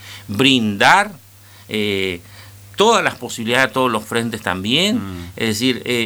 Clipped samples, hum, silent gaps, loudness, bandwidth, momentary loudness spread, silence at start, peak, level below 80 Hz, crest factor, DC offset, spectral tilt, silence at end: under 0.1%; none; none; -17 LUFS; over 20 kHz; 12 LU; 0 s; 0 dBFS; -54 dBFS; 18 dB; under 0.1%; -3.5 dB/octave; 0 s